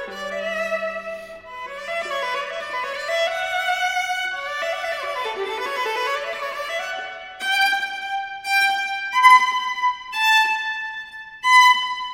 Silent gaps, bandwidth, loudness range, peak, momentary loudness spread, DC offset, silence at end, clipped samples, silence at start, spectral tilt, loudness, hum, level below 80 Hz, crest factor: none; 16.5 kHz; 8 LU; -2 dBFS; 15 LU; under 0.1%; 0 s; under 0.1%; 0 s; 0.5 dB/octave; -20 LUFS; none; -62 dBFS; 20 dB